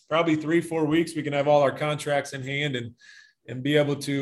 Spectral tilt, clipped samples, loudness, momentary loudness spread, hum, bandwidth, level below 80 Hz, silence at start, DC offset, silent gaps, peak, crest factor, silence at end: -5.5 dB/octave; under 0.1%; -25 LUFS; 10 LU; none; 12.5 kHz; -66 dBFS; 0.1 s; under 0.1%; none; -8 dBFS; 18 dB; 0 s